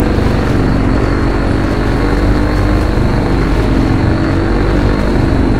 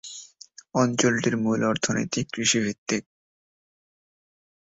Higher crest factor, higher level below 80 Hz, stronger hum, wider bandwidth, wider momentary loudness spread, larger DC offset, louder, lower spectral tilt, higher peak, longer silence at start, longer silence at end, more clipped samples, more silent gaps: second, 12 dB vs 20 dB; first, -16 dBFS vs -62 dBFS; neither; first, 11.5 kHz vs 8 kHz; second, 1 LU vs 10 LU; first, 4% vs under 0.1%; first, -13 LUFS vs -24 LUFS; first, -7.5 dB/octave vs -3.5 dB/octave; first, 0 dBFS vs -6 dBFS; about the same, 0 s vs 0.05 s; second, 0 s vs 1.7 s; neither; second, none vs 2.78-2.86 s